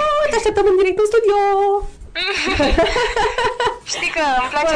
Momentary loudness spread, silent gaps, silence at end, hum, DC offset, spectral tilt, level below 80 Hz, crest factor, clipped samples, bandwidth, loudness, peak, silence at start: 6 LU; none; 0 s; none; under 0.1%; -3.5 dB/octave; -32 dBFS; 10 dB; under 0.1%; 10.5 kHz; -17 LUFS; -6 dBFS; 0 s